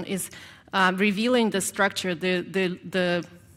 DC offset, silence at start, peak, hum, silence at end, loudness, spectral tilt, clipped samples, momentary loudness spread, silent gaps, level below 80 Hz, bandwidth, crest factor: under 0.1%; 0 s; -8 dBFS; none; 0.2 s; -25 LUFS; -4 dB/octave; under 0.1%; 9 LU; none; -66 dBFS; 16.5 kHz; 18 dB